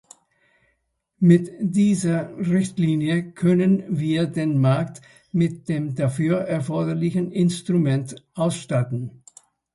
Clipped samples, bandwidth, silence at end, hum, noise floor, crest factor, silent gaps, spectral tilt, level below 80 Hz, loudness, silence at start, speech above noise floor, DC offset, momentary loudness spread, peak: under 0.1%; 11.5 kHz; 0.65 s; none; -72 dBFS; 18 dB; none; -7.5 dB/octave; -60 dBFS; -22 LUFS; 1.2 s; 51 dB; under 0.1%; 7 LU; -4 dBFS